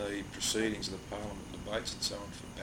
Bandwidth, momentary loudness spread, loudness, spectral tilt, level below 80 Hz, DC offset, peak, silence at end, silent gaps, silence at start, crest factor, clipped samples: 17.5 kHz; 11 LU; -36 LUFS; -3 dB/octave; -54 dBFS; under 0.1%; -20 dBFS; 0 s; none; 0 s; 18 dB; under 0.1%